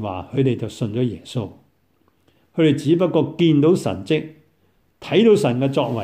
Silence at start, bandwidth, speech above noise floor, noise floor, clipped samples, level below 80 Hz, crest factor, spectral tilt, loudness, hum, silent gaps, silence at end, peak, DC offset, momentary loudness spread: 0 s; 15 kHz; 44 dB; -63 dBFS; under 0.1%; -58 dBFS; 16 dB; -7 dB/octave; -19 LUFS; none; none; 0 s; -4 dBFS; under 0.1%; 14 LU